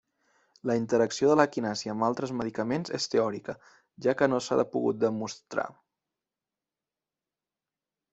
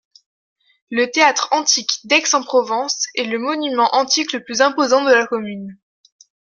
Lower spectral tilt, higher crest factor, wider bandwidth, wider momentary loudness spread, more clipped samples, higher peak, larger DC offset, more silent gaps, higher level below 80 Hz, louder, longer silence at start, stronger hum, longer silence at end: first, -5 dB/octave vs -1 dB/octave; first, 24 dB vs 18 dB; second, 8.2 kHz vs 10 kHz; about the same, 11 LU vs 9 LU; neither; second, -6 dBFS vs 0 dBFS; neither; neither; about the same, -70 dBFS vs -70 dBFS; second, -28 LUFS vs -16 LUFS; second, 0.65 s vs 0.9 s; neither; first, 2.4 s vs 0.85 s